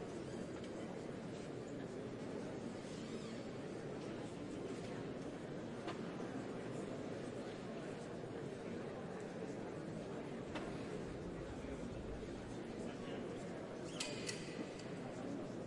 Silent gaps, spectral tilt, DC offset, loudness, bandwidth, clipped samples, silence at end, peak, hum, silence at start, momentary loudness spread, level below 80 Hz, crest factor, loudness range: none; -5.5 dB/octave; under 0.1%; -47 LUFS; 11.5 kHz; under 0.1%; 0 s; -26 dBFS; none; 0 s; 2 LU; -66 dBFS; 20 dB; 1 LU